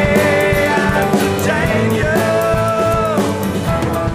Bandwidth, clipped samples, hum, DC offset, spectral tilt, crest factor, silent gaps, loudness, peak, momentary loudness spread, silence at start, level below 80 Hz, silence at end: 16 kHz; under 0.1%; none; 0.2%; -5.5 dB/octave; 12 dB; none; -15 LUFS; -2 dBFS; 4 LU; 0 s; -32 dBFS; 0 s